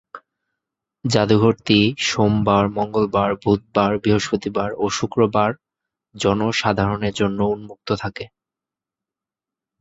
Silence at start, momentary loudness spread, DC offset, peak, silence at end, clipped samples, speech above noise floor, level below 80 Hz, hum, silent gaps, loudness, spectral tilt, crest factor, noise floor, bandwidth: 0.15 s; 9 LU; under 0.1%; 0 dBFS; 1.55 s; under 0.1%; 70 dB; -46 dBFS; none; none; -19 LUFS; -5.5 dB/octave; 20 dB; -88 dBFS; 8 kHz